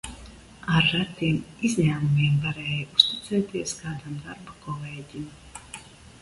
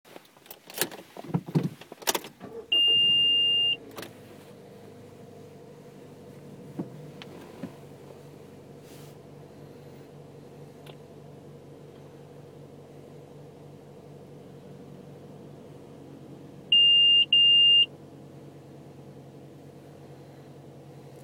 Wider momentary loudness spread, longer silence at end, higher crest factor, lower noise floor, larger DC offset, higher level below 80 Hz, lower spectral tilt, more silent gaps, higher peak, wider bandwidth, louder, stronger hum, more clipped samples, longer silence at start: second, 20 LU vs 31 LU; second, 0.05 s vs 1.1 s; about the same, 26 dB vs 22 dB; second, -46 dBFS vs -51 dBFS; neither; first, -52 dBFS vs -72 dBFS; first, -5 dB/octave vs -2 dB/octave; neither; first, 0 dBFS vs -8 dBFS; second, 11.5 kHz vs 19 kHz; second, -24 LUFS vs -20 LUFS; neither; neither; second, 0.05 s vs 0.75 s